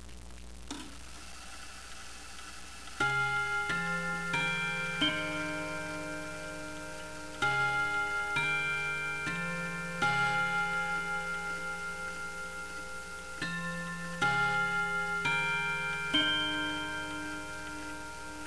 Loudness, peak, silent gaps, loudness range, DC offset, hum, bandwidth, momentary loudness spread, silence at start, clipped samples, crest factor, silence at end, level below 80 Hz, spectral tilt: -32 LUFS; -16 dBFS; none; 5 LU; 0.4%; none; 11 kHz; 16 LU; 0 s; under 0.1%; 18 dB; 0 s; -56 dBFS; -3 dB/octave